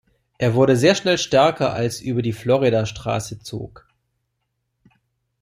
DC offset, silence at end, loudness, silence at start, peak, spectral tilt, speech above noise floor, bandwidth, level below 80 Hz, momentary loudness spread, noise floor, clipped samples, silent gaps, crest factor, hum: under 0.1%; 1.75 s; -19 LUFS; 0.4 s; -2 dBFS; -5.5 dB/octave; 56 dB; 15.5 kHz; -52 dBFS; 16 LU; -75 dBFS; under 0.1%; none; 18 dB; none